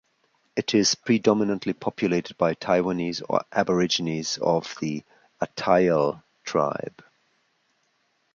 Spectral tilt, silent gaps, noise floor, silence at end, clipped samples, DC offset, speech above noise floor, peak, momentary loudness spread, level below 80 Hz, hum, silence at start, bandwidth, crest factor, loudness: -4.5 dB/octave; none; -70 dBFS; 1.45 s; under 0.1%; under 0.1%; 46 dB; -4 dBFS; 11 LU; -62 dBFS; none; 0.55 s; 7.6 kHz; 22 dB; -24 LUFS